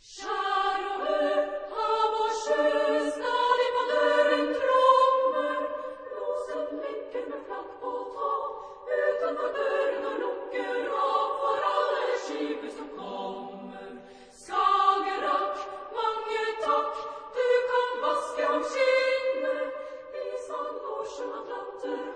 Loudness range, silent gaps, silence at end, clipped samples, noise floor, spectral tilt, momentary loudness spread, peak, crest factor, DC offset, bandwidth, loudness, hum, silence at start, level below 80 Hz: 7 LU; none; 0 s; under 0.1%; -49 dBFS; -2.5 dB/octave; 13 LU; -8 dBFS; 20 dB; under 0.1%; 10 kHz; -28 LUFS; none; 0.05 s; -66 dBFS